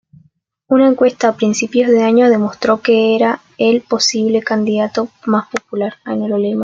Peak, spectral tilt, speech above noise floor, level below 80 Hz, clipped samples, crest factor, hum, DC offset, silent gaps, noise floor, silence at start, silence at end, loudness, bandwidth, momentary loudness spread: -2 dBFS; -4.5 dB/octave; 41 dB; -60 dBFS; under 0.1%; 12 dB; none; under 0.1%; none; -55 dBFS; 0.7 s; 0 s; -14 LUFS; 7.8 kHz; 9 LU